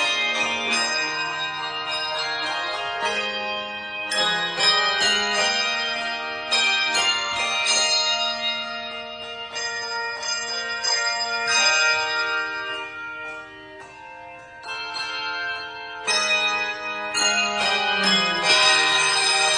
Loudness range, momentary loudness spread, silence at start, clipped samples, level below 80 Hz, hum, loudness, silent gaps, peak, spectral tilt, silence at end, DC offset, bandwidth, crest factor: 6 LU; 15 LU; 0 s; under 0.1%; -62 dBFS; none; -21 LUFS; none; -6 dBFS; 0 dB/octave; 0 s; under 0.1%; 10 kHz; 18 dB